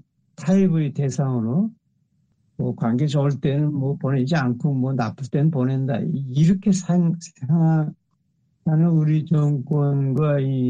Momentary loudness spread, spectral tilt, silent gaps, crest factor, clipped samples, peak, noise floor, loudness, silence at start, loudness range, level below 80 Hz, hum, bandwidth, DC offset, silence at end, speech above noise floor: 6 LU; -8 dB/octave; none; 12 dB; under 0.1%; -8 dBFS; -67 dBFS; -21 LUFS; 0.4 s; 2 LU; -56 dBFS; none; 8.8 kHz; under 0.1%; 0 s; 47 dB